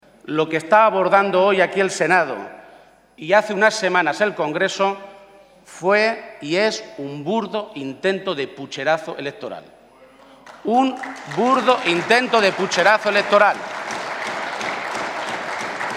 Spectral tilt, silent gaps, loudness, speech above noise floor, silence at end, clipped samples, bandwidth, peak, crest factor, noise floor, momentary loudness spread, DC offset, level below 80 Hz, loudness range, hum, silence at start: -4 dB/octave; none; -19 LUFS; 30 dB; 0 s; under 0.1%; 13.5 kHz; 0 dBFS; 20 dB; -49 dBFS; 14 LU; under 0.1%; -68 dBFS; 7 LU; none; 0.25 s